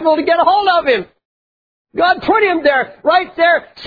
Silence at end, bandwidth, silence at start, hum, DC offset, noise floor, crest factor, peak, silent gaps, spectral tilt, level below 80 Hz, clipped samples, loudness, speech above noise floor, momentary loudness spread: 0 s; 5 kHz; 0 s; none; under 0.1%; under -90 dBFS; 14 dB; 0 dBFS; 1.25-1.85 s; -6 dB/octave; -52 dBFS; under 0.1%; -13 LUFS; over 77 dB; 5 LU